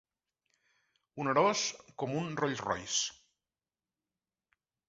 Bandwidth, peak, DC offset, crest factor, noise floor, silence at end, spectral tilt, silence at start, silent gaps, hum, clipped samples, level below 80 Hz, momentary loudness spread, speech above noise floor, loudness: 8 kHz; -14 dBFS; under 0.1%; 22 dB; under -90 dBFS; 1.75 s; -3 dB/octave; 1.15 s; none; none; under 0.1%; -70 dBFS; 10 LU; over 57 dB; -33 LUFS